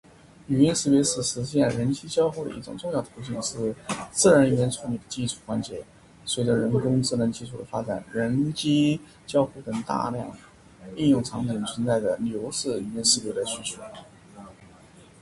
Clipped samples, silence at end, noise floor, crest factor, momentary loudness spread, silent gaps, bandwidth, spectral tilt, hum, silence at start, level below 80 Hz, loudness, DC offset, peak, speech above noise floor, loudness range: under 0.1%; 0.55 s; -51 dBFS; 20 dB; 13 LU; none; 11.5 kHz; -4.5 dB/octave; none; 0.5 s; -56 dBFS; -25 LUFS; under 0.1%; -6 dBFS; 26 dB; 3 LU